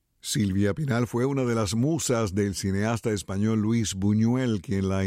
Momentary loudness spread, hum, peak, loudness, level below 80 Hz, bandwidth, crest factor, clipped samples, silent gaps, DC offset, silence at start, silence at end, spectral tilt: 3 LU; none; -14 dBFS; -26 LUFS; -54 dBFS; 16 kHz; 12 dB; under 0.1%; none; under 0.1%; 0.25 s; 0 s; -5.5 dB/octave